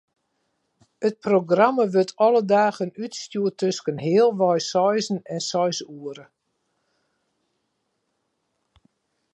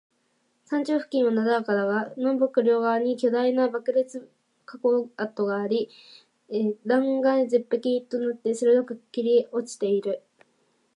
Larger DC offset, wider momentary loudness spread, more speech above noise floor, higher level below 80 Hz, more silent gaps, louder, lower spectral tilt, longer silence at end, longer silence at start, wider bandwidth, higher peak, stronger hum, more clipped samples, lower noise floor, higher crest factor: neither; first, 12 LU vs 8 LU; first, 53 dB vs 46 dB; first, -74 dBFS vs -84 dBFS; neither; first, -22 LUFS vs -25 LUFS; about the same, -5 dB/octave vs -6 dB/octave; first, 3.15 s vs 0.8 s; first, 1 s vs 0.7 s; about the same, 10.5 kHz vs 11 kHz; first, -4 dBFS vs -10 dBFS; neither; neither; first, -75 dBFS vs -70 dBFS; about the same, 20 dB vs 16 dB